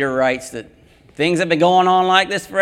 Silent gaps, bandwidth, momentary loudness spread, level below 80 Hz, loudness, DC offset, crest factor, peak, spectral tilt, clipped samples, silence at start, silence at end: none; 15.5 kHz; 13 LU; -54 dBFS; -16 LUFS; under 0.1%; 16 dB; 0 dBFS; -4.5 dB/octave; under 0.1%; 0 s; 0 s